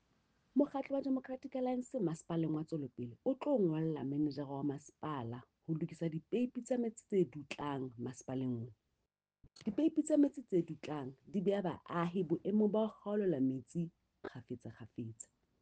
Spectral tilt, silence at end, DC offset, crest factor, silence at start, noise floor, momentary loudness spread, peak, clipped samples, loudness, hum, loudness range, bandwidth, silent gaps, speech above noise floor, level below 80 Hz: -7.5 dB/octave; 0.5 s; under 0.1%; 18 dB; 0.55 s; -88 dBFS; 14 LU; -20 dBFS; under 0.1%; -38 LUFS; none; 3 LU; 9.4 kHz; none; 51 dB; -76 dBFS